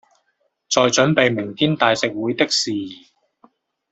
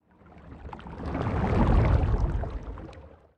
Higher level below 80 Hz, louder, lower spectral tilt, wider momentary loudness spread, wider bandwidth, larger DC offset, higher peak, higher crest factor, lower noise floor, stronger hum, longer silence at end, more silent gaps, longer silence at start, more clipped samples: second, -60 dBFS vs -30 dBFS; first, -18 LUFS vs -27 LUFS; second, -3.5 dB/octave vs -9 dB/octave; second, 8 LU vs 21 LU; first, 8.2 kHz vs 6.6 kHz; neither; first, -2 dBFS vs -10 dBFS; about the same, 20 dB vs 16 dB; first, -69 dBFS vs -51 dBFS; neither; first, 0.95 s vs 0.3 s; neither; first, 0.7 s vs 0.35 s; neither